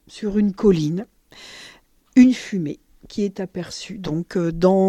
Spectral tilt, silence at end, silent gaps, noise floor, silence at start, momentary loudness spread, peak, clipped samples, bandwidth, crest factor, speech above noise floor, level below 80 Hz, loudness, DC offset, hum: -7 dB/octave; 0 s; none; -50 dBFS; 0.15 s; 24 LU; -2 dBFS; under 0.1%; 10 kHz; 18 dB; 31 dB; -46 dBFS; -21 LUFS; under 0.1%; none